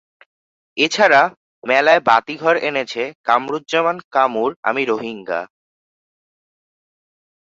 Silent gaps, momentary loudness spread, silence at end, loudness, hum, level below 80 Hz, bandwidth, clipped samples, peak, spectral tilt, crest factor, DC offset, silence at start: 1.37-1.62 s, 3.15-3.24 s, 4.04-4.11 s, 4.56-4.63 s; 13 LU; 2 s; -17 LUFS; none; -68 dBFS; 7.8 kHz; under 0.1%; 0 dBFS; -3.5 dB/octave; 18 dB; under 0.1%; 0.75 s